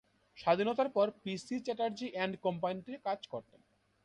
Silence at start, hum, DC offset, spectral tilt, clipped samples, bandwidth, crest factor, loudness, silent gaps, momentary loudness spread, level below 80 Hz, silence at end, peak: 0.35 s; none; under 0.1%; -5.5 dB/octave; under 0.1%; 11 kHz; 18 dB; -35 LUFS; none; 10 LU; -76 dBFS; 0.65 s; -16 dBFS